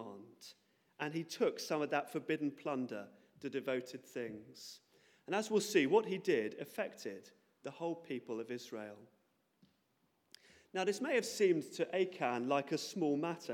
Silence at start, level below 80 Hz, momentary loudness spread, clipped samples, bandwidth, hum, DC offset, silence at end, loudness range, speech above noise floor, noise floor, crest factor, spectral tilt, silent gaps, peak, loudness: 0 s; under -90 dBFS; 19 LU; under 0.1%; 17.5 kHz; none; under 0.1%; 0 s; 9 LU; 41 dB; -79 dBFS; 22 dB; -4.5 dB/octave; none; -16 dBFS; -38 LUFS